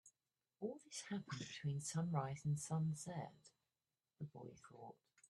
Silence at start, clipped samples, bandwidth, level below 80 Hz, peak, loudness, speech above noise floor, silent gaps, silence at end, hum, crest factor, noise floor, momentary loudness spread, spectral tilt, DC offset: 0.05 s; under 0.1%; 12.5 kHz; -80 dBFS; -26 dBFS; -46 LUFS; over 44 dB; none; 0.05 s; none; 20 dB; under -90 dBFS; 16 LU; -5.5 dB/octave; under 0.1%